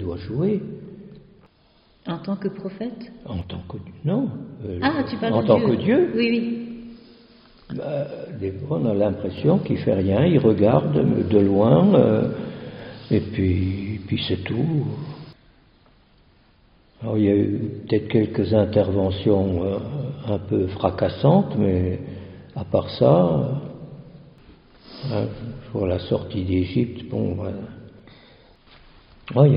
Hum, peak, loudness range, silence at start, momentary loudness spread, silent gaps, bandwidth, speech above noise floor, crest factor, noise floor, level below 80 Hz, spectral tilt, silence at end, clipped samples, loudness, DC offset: none; -2 dBFS; 10 LU; 0 s; 18 LU; none; 5.4 kHz; 37 dB; 20 dB; -58 dBFS; -50 dBFS; -7.5 dB/octave; 0 s; under 0.1%; -22 LUFS; under 0.1%